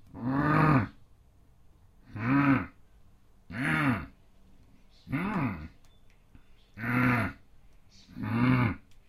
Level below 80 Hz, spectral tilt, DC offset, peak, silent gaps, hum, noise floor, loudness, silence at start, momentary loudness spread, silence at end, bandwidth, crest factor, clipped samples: -52 dBFS; -8 dB/octave; under 0.1%; -10 dBFS; none; none; -59 dBFS; -29 LUFS; 0.15 s; 18 LU; 0.15 s; 14 kHz; 20 dB; under 0.1%